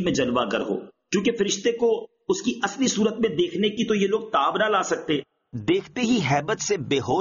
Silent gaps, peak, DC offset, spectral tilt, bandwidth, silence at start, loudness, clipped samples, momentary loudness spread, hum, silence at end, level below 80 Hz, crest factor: none; -8 dBFS; under 0.1%; -4 dB/octave; 7.4 kHz; 0 s; -24 LUFS; under 0.1%; 6 LU; none; 0 s; -58 dBFS; 14 dB